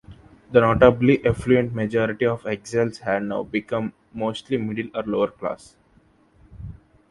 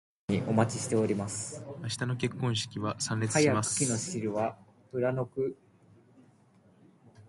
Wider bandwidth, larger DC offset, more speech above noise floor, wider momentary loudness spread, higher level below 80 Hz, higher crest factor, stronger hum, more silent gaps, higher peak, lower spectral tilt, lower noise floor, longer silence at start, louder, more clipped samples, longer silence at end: about the same, 11.5 kHz vs 11.5 kHz; neither; first, 37 dB vs 32 dB; first, 16 LU vs 10 LU; first, -46 dBFS vs -64 dBFS; about the same, 22 dB vs 20 dB; neither; neither; first, 0 dBFS vs -12 dBFS; first, -7 dB/octave vs -4.5 dB/octave; second, -58 dBFS vs -62 dBFS; second, 0.1 s vs 0.3 s; first, -22 LUFS vs -31 LUFS; neither; first, 0.35 s vs 0.05 s